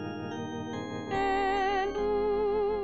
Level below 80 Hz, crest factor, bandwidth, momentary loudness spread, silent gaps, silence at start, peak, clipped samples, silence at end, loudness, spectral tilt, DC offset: -50 dBFS; 12 dB; 7.8 kHz; 9 LU; none; 0 s; -18 dBFS; under 0.1%; 0 s; -30 LUFS; -6 dB/octave; 0.3%